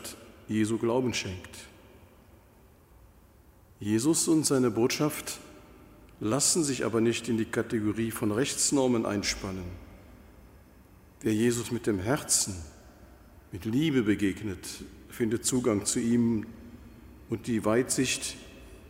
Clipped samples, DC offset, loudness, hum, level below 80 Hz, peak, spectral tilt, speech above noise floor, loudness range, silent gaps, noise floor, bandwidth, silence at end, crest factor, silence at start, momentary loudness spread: under 0.1%; under 0.1%; -28 LUFS; none; -56 dBFS; -12 dBFS; -4 dB/octave; 29 dB; 5 LU; none; -57 dBFS; 16 kHz; 0 s; 18 dB; 0 s; 18 LU